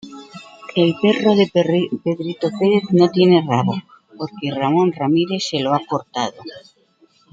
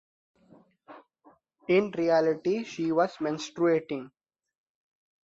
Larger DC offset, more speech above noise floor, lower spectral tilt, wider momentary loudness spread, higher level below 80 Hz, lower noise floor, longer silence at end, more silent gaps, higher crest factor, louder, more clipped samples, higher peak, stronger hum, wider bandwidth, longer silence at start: neither; first, 39 dB vs 35 dB; about the same, -6.5 dB/octave vs -6 dB/octave; first, 17 LU vs 10 LU; first, -64 dBFS vs -74 dBFS; second, -56 dBFS vs -62 dBFS; second, 0.75 s vs 1.25 s; neither; about the same, 16 dB vs 18 dB; first, -18 LUFS vs -27 LUFS; neither; first, -2 dBFS vs -12 dBFS; neither; about the same, 7.8 kHz vs 7.8 kHz; second, 0.05 s vs 0.9 s